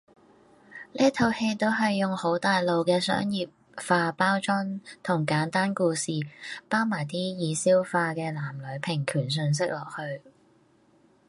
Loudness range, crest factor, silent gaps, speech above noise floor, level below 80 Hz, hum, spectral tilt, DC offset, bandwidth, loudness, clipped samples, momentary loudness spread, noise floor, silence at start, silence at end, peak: 2 LU; 20 dB; none; 35 dB; -66 dBFS; none; -5 dB/octave; under 0.1%; 11.5 kHz; -27 LUFS; under 0.1%; 12 LU; -62 dBFS; 0.7 s; 1.1 s; -8 dBFS